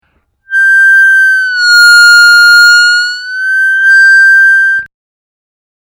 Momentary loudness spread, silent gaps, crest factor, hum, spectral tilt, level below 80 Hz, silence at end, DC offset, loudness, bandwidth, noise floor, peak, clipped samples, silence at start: 9 LU; none; 6 dB; none; 6 dB/octave; -62 dBFS; 1.15 s; under 0.1%; -3 LUFS; over 20 kHz; -48 dBFS; 0 dBFS; under 0.1%; 0.5 s